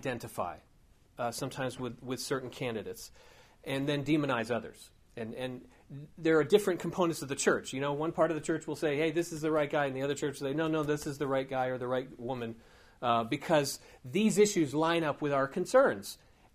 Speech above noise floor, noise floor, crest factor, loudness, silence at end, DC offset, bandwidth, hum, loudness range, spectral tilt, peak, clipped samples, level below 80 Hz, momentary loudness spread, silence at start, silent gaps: 31 dB; -62 dBFS; 20 dB; -32 LUFS; 0.4 s; under 0.1%; 15.5 kHz; none; 6 LU; -5 dB/octave; -12 dBFS; under 0.1%; -64 dBFS; 16 LU; 0 s; none